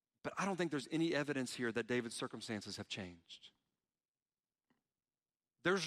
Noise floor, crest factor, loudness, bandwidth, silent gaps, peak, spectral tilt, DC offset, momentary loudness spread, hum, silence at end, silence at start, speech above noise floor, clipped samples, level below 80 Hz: under -90 dBFS; 20 dB; -40 LUFS; 14.5 kHz; 4.08-4.14 s, 4.22-4.26 s; -22 dBFS; -4.5 dB/octave; under 0.1%; 12 LU; none; 0 s; 0.25 s; over 49 dB; under 0.1%; -80 dBFS